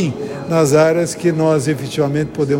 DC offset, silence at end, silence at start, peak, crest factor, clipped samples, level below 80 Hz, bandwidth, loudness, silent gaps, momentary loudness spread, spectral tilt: under 0.1%; 0 s; 0 s; -2 dBFS; 14 dB; under 0.1%; -50 dBFS; 16.5 kHz; -16 LUFS; none; 7 LU; -6 dB/octave